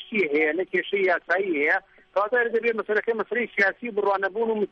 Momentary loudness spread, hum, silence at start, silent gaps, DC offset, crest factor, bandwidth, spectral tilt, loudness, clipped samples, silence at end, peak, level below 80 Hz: 4 LU; none; 0 s; none; under 0.1%; 16 dB; 6.6 kHz; -6 dB/octave; -24 LUFS; under 0.1%; 0.05 s; -8 dBFS; -70 dBFS